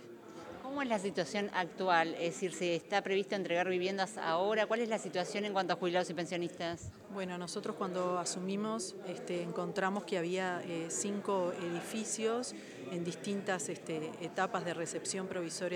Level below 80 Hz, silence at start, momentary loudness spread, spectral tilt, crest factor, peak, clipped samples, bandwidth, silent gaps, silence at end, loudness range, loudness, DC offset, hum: -78 dBFS; 0 s; 8 LU; -4 dB/octave; 22 dB; -14 dBFS; under 0.1%; 19 kHz; none; 0 s; 4 LU; -36 LUFS; under 0.1%; none